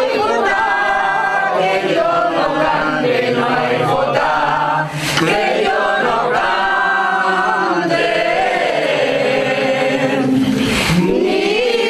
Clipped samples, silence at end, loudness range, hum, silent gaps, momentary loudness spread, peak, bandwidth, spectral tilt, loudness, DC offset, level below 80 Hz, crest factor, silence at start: under 0.1%; 0 s; 0 LU; none; none; 1 LU; -2 dBFS; 14 kHz; -4.5 dB/octave; -15 LUFS; under 0.1%; -44 dBFS; 14 dB; 0 s